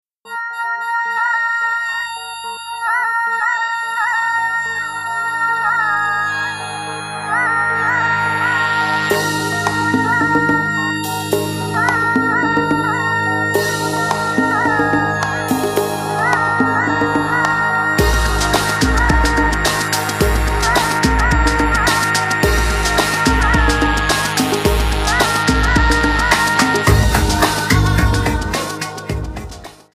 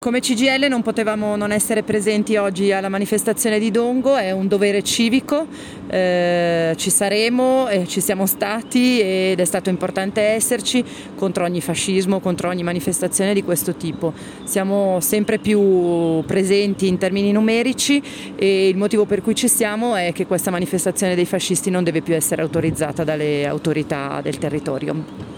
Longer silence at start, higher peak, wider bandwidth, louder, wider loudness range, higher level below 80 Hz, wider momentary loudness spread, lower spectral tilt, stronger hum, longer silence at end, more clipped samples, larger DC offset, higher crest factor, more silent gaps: first, 0.25 s vs 0 s; first, 0 dBFS vs -4 dBFS; second, 15.5 kHz vs 19 kHz; about the same, -16 LUFS vs -18 LUFS; about the same, 4 LU vs 3 LU; first, -24 dBFS vs -54 dBFS; about the same, 7 LU vs 7 LU; about the same, -4 dB/octave vs -4 dB/octave; first, 50 Hz at -50 dBFS vs none; first, 0.2 s vs 0 s; neither; neither; about the same, 16 dB vs 14 dB; neither